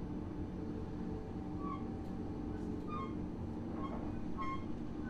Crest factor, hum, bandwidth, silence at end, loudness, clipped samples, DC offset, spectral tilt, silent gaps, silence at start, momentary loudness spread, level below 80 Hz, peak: 14 dB; none; 9.6 kHz; 0 s; -43 LUFS; under 0.1%; under 0.1%; -8.5 dB/octave; none; 0 s; 2 LU; -52 dBFS; -28 dBFS